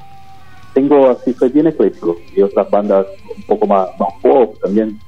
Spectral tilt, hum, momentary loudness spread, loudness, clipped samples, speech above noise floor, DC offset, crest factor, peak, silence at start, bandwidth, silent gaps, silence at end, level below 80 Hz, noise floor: -9 dB/octave; none; 8 LU; -14 LUFS; under 0.1%; 28 dB; 1%; 14 dB; 0 dBFS; 0.75 s; 6.6 kHz; none; 0.1 s; -52 dBFS; -41 dBFS